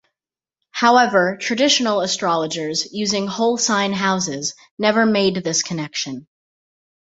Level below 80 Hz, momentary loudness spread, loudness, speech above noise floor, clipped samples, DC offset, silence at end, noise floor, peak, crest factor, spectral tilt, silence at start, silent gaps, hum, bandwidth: -62 dBFS; 10 LU; -18 LUFS; over 71 dB; under 0.1%; under 0.1%; 0.95 s; under -90 dBFS; -2 dBFS; 18 dB; -3 dB/octave; 0.75 s; 4.71-4.77 s; none; 8 kHz